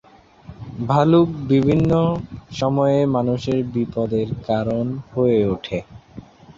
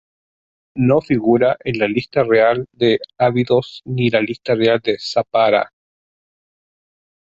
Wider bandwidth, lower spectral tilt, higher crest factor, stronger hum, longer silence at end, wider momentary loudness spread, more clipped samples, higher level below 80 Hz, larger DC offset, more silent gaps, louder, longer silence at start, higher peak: about the same, 7.6 kHz vs 8 kHz; first, -8.5 dB/octave vs -7 dB/octave; about the same, 16 dB vs 16 dB; neither; second, 0.05 s vs 1.55 s; first, 13 LU vs 5 LU; neither; first, -46 dBFS vs -54 dBFS; neither; neither; second, -20 LUFS vs -17 LUFS; second, 0.5 s vs 0.75 s; about the same, -4 dBFS vs -2 dBFS